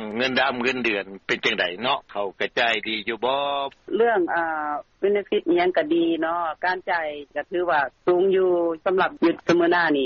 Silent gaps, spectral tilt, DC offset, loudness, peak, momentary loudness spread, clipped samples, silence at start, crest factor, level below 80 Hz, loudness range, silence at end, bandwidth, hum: none; -2 dB/octave; under 0.1%; -23 LUFS; -8 dBFS; 7 LU; under 0.1%; 0 s; 14 dB; -62 dBFS; 2 LU; 0 s; 7.2 kHz; none